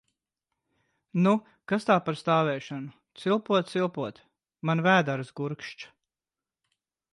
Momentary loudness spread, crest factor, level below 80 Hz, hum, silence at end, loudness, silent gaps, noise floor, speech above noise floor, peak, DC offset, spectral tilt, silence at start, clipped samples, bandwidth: 15 LU; 20 dB; -74 dBFS; none; 1.25 s; -27 LUFS; none; under -90 dBFS; over 63 dB; -8 dBFS; under 0.1%; -6.5 dB/octave; 1.15 s; under 0.1%; 11.5 kHz